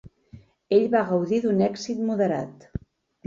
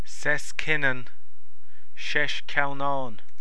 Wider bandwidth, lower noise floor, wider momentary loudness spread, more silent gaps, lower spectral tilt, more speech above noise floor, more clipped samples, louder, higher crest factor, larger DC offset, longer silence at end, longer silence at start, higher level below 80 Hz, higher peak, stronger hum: second, 7.4 kHz vs 11 kHz; second, -50 dBFS vs -63 dBFS; first, 17 LU vs 11 LU; neither; first, -7 dB/octave vs -3.5 dB/octave; second, 27 dB vs 35 dB; neither; first, -24 LUFS vs -27 LUFS; about the same, 18 dB vs 22 dB; second, under 0.1% vs 10%; first, 0.5 s vs 0.25 s; about the same, 0.05 s vs 0.05 s; first, -54 dBFS vs -60 dBFS; about the same, -8 dBFS vs -6 dBFS; neither